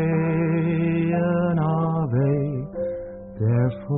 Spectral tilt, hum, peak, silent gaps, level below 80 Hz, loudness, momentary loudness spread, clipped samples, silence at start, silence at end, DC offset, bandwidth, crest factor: -7.5 dB/octave; none; -10 dBFS; none; -50 dBFS; -23 LUFS; 8 LU; under 0.1%; 0 s; 0 s; under 0.1%; 3.8 kHz; 12 dB